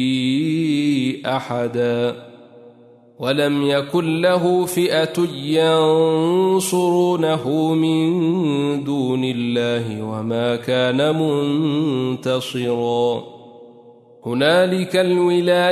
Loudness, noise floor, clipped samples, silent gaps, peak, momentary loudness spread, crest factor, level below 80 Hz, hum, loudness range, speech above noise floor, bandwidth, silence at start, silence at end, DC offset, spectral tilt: -19 LUFS; -48 dBFS; under 0.1%; none; -4 dBFS; 6 LU; 14 dB; -64 dBFS; none; 4 LU; 30 dB; 13.5 kHz; 0 s; 0 s; under 0.1%; -5.5 dB/octave